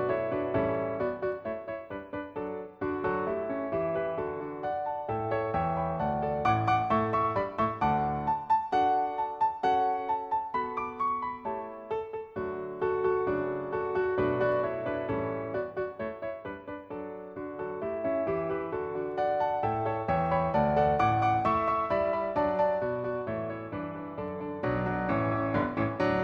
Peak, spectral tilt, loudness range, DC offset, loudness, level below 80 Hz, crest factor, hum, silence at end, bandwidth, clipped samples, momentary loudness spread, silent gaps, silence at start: -14 dBFS; -8.5 dB/octave; 6 LU; under 0.1%; -30 LUFS; -54 dBFS; 16 dB; none; 0 s; 7.2 kHz; under 0.1%; 11 LU; none; 0 s